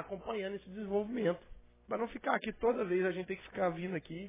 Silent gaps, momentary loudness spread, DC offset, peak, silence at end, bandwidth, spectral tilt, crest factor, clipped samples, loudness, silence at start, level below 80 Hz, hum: none; 9 LU; under 0.1%; -16 dBFS; 0 s; 3.8 kHz; -5 dB/octave; 22 dB; under 0.1%; -36 LUFS; 0 s; -62 dBFS; none